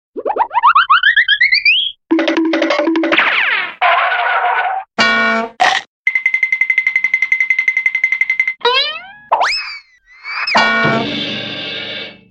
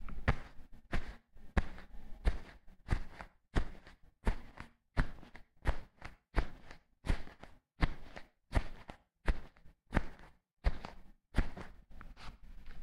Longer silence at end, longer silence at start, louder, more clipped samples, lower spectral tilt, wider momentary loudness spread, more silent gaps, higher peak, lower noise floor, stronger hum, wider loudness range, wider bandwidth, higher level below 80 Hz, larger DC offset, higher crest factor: first, 0.2 s vs 0 s; first, 0.15 s vs 0 s; first, -13 LUFS vs -42 LUFS; neither; second, -3 dB/octave vs -6.5 dB/octave; second, 11 LU vs 19 LU; first, 5.87-6.05 s vs none; first, -2 dBFS vs -12 dBFS; second, -39 dBFS vs -57 dBFS; neither; about the same, 4 LU vs 2 LU; about the same, 10 kHz vs 11 kHz; second, -56 dBFS vs -40 dBFS; neither; second, 14 dB vs 26 dB